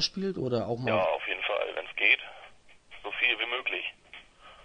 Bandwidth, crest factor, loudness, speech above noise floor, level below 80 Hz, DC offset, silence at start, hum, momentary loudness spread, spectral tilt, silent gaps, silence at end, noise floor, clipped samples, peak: 10 kHz; 22 dB; -28 LUFS; 24 dB; -64 dBFS; under 0.1%; 0 s; none; 17 LU; -4 dB/octave; none; 0.05 s; -53 dBFS; under 0.1%; -8 dBFS